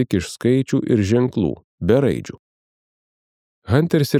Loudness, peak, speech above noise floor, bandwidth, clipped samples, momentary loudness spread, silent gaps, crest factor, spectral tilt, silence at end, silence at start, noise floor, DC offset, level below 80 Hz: -19 LUFS; -2 dBFS; over 72 dB; 15.5 kHz; under 0.1%; 8 LU; 1.64-1.78 s, 2.39-3.62 s; 18 dB; -7 dB/octave; 0 s; 0 s; under -90 dBFS; under 0.1%; -48 dBFS